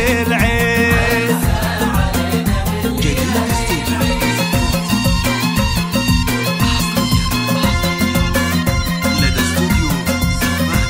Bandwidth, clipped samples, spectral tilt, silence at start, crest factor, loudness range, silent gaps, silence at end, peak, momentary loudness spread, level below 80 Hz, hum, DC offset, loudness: 16.5 kHz; under 0.1%; -4.5 dB/octave; 0 s; 14 dB; 1 LU; none; 0 s; 0 dBFS; 3 LU; -24 dBFS; none; under 0.1%; -16 LUFS